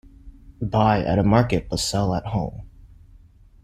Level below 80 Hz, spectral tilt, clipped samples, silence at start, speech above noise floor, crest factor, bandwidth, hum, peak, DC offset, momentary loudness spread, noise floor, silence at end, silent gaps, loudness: -40 dBFS; -6 dB/octave; under 0.1%; 0.25 s; 29 dB; 20 dB; 14 kHz; none; -4 dBFS; under 0.1%; 13 LU; -50 dBFS; 0.8 s; none; -22 LUFS